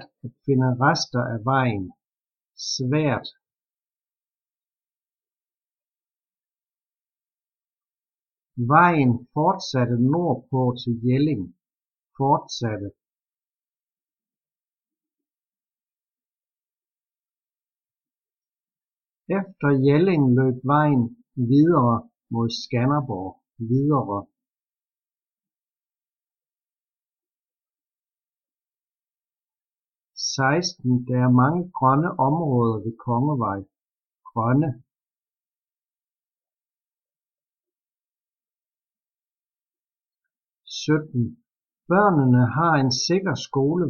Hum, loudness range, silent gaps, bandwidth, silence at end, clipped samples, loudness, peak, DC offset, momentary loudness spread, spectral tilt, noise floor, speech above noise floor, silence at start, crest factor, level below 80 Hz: none; 10 LU; 27.39-27.43 s; 7 kHz; 0 s; under 0.1%; -22 LUFS; -2 dBFS; under 0.1%; 13 LU; -6.5 dB/octave; under -90 dBFS; over 69 dB; 0 s; 24 dB; -64 dBFS